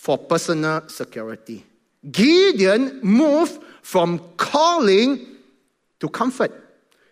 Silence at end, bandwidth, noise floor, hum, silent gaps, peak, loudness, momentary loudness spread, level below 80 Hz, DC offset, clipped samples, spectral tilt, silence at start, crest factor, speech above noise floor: 0.55 s; 15.5 kHz; -64 dBFS; none; none; -4 dBFS; -18 LUFS; 17 LU; -68 dBFS; under 0.1%; under 0.1%; -5 dB/octave; 0.05 s; 16 dB; 46 dB